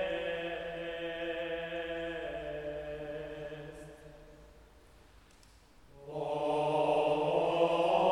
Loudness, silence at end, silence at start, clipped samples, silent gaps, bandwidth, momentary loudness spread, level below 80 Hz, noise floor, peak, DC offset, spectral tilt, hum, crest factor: -34 LUFS; 0 s; 0 s; under 0.1%; none; 12.5 kHz; 17 LU; -60 dBFS; -60 dBFS; -16 dBFS; under 0.1%; -5.5 dB/octave; none; 20 dB